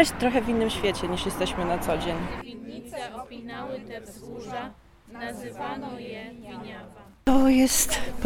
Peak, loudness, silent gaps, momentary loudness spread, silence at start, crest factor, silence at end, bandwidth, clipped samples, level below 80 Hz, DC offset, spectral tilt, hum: -4 dBFS; -26 LUFS; none; 20 LU; 0 s; 24 dB; 0 s; 16.5 kHz; under 0.1%; -42 dBFS; under 0.1%; -3.5 dB/octave; none